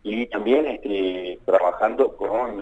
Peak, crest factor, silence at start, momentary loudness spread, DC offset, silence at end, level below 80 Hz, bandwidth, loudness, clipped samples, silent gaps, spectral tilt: -4 dBFS; 18 dB; 0.05 s; 6 LU; under 0.1%; 0 s; -52 dBFS; 8 kHz; -22 LUFS; under 0.1%; none; -6.5 dB/octave